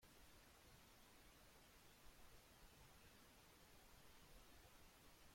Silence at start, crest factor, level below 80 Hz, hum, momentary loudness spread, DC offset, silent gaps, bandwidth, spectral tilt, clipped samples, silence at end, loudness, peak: 0 s; 14 dB; -74 dBFS; none; 1 LU; under 0.1%; none; 16.5 kHz; -3 dB/octave; under 0.1%; 0 s; -68 LUFS; -52 dBFS